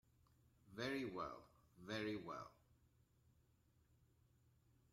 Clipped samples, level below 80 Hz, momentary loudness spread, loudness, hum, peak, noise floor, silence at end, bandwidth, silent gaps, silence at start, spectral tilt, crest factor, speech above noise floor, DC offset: under 0.1%; -80 dBFS; 16 LU; -48 LUFS; none; -34 dBFS; -77 dBFS; 2.4 s; 16 kHz; none; 0.65 s; -5.5 dB/octave; 20 dB; 28 dB; under 0.1%